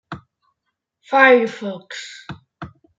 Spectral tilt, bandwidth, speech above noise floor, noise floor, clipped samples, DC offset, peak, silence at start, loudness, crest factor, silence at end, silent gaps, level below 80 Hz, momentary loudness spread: -4.5 dB/octave; 7.8 kHz; 60 dB; -77 dBFS; under 0.1%; under 0.1%; -2 dBFS; 0.1 s; -15 LUFS; 20 dB; 0.3 s; none; -62 dBFS; 26 LU